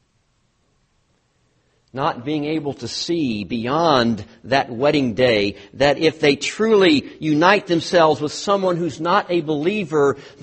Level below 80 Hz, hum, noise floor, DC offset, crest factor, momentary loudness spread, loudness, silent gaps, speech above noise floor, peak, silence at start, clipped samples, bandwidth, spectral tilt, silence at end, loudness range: -54 dBFS; none; -64 dBFS; under 0.1%; 18 dB; 9 LU; -19 LUFS; none; 46 dB; 0 dBFS; 1.95 s; under 0.1%; 8.8 kHz; -5 dB/octave; 0.15 s; 8 LU